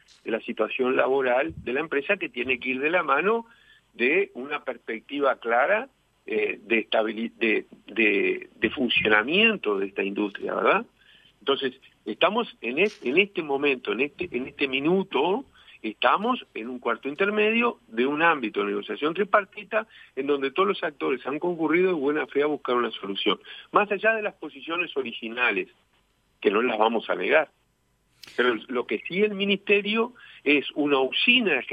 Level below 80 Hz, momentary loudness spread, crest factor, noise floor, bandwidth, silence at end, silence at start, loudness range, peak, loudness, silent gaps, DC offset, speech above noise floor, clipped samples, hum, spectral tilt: -66 dBFS; 10 LU; 20 dB; -69 dBFS; 6.4 kHz; 0 s; 0.25 s; 3 LU; -6 dBFS; -25 LUFS; none; under 0.1%; 44 dB; under 0.1%; none; -6 dB/octave